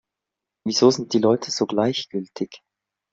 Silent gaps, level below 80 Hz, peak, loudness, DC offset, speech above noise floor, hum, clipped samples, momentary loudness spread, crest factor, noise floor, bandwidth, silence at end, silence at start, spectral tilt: none; -66 dBFS; -4 dBFS; -21 LUFS; under 0.1%; 64 dB; none; under 0.1%; 14 LU; 20 dB; -86 dBFS; 7.8 kHz; 0.55 s; 0.65 s; -4.5 dB/octave